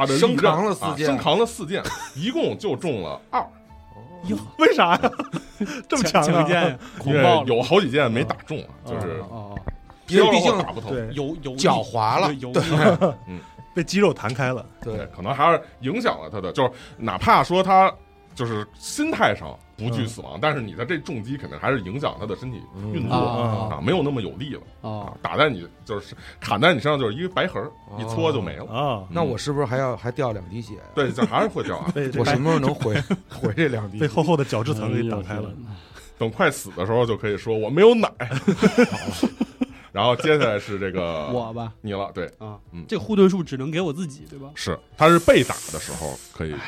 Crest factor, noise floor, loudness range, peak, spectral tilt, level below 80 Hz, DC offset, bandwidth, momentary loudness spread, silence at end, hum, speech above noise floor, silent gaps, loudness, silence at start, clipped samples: 20 dB; -44 dBFS; 5 LU; -2 dBFS; -5.5 dB/octave; -48 dBFS; under 0.1%; 15.5 kHz; 15 LU; 0 s; none; 22 dB; none; -22 LUFS; 0 s; under 0.1%